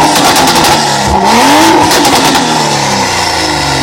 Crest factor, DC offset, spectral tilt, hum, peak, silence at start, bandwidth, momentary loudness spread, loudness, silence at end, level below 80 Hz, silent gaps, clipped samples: 8 dB; under 0.1%; -2.5 dB/octave; none; 0 dBFS; 0 s; over 20 kHz; 5 LU; -6 LUFS; 0 s; -30 dBFS; none; 1%